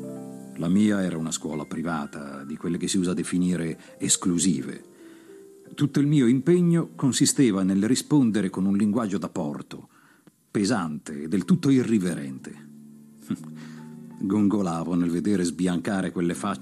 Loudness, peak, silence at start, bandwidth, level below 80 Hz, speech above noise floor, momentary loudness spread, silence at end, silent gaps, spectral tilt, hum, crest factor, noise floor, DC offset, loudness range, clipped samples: -24 LUFS; -8 dBFS; 0 s; 14 kHz; -66 dBFS; 33 dB; 17 LU; 0 s; none; -5.5 dB/octave; none; 16 dB; -57 dBFS; under 0.1%; 6 LU; under 0.1%